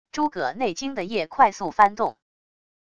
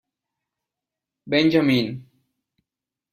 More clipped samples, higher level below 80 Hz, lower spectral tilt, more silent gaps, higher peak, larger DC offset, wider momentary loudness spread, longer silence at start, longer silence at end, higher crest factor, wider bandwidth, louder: neither; about the same, -60 dBFS vs -64 dBFS; second, -4 dB/octave vs -6.5 dB/octave; neither; about the same, -4 dBFS vs -6 dBFS; first, 0.4% vs under 0.1%; second, 9 LU vs 14 LU; second, 0.15 s vs 1.25 s; second, 0.8 s vs 1.1 s; about the same, 20 dB vs 20 dB; second, 10 kHz vs 15 kHz; second, -23 LUFS vs -20 LUFS